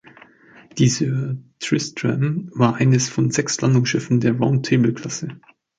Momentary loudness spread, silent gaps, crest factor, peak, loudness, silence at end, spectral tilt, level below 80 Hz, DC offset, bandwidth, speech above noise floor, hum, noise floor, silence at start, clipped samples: 11 LU; none; 18 dB; -2 dBFS; -20 LUFS; 0.45 s; -5.5 dB/octave; -58 dBFS; under 0.1%; 9.2 kHz; 29 dB; none; -48 dBFS; 0.75 s; under 0.1%